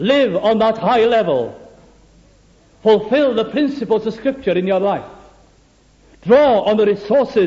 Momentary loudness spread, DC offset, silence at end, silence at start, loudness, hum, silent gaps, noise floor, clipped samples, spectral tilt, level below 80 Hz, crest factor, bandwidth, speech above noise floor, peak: 8 LU; under 0.1%; 0 s; 0 s; -16 LUFS; none; none; -52 dBFS; under 0.1%; -7 dB/octave; -52 dBFS; 14 dB; 7.6 kHz; 37 dB; -2 dBFS